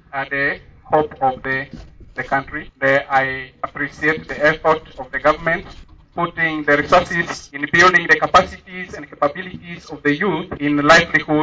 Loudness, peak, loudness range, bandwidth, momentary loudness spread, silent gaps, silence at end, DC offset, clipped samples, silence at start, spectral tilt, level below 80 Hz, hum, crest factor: -17 LUFS; -2 dBFS; 5 LU; 8 kHz; 18 LU; none; 0 s; under 0.1%; under 0.1%; 0.15 s; -4.5 dB/octave; -44 dBFS; none; 16 dB